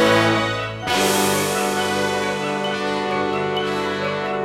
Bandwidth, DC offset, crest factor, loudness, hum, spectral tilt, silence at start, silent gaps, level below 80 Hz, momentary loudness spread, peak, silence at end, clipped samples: 16.5 kHz; under 0.1%; 18 dB; -20 LUFS; none; -3.5 dB/octave; 0 s; none; -52 dBFS; 6 LU; -2 dBFS; 0 s; under 0.1%